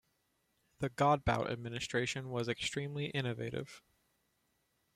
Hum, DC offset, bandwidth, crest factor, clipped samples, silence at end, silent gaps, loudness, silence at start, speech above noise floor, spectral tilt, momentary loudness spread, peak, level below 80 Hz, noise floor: none; under 0.1%; 14.5 kHz; 22 dB; under 0.1%; 1.15 s; none; -36 LUFS; 0.8 s; 43 dB; -5 dB/octave; 11 LU; -16 dBFS; -58 dBFS; -79 dBFS